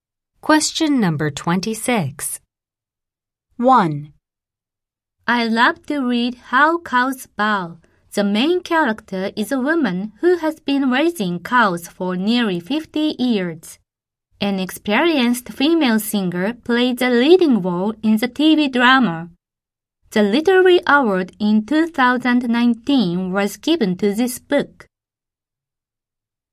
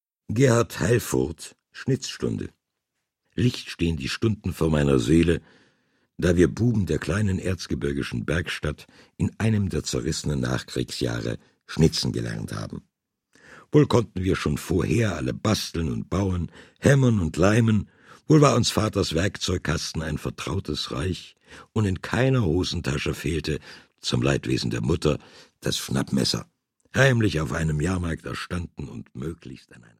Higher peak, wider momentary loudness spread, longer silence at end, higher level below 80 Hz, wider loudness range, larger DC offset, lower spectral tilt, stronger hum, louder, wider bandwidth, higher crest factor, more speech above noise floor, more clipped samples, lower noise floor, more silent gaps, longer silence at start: about the same, 0 dBFS vs -2 dBFS; second, 10 LU vs 13 LU; first, 1.85 s vs 0.25 s; second, -58 dBFS vs -42 dBFS; about the same, 5 LU vs 5 LU; neither; about the same, -4.5 dB/octave vs -5.5 dB/octave; neither; first, -17 LUFS vs -24 LUFS; about the same, 15.5 kHz vs 15.5 kHz; about the same, 18 dB vs 22 dB; first, 71 dB vs 58 dB; neither; first, -88 dBFS vs -81 dBFS; neither; first, 0.45 s vs 0.3 s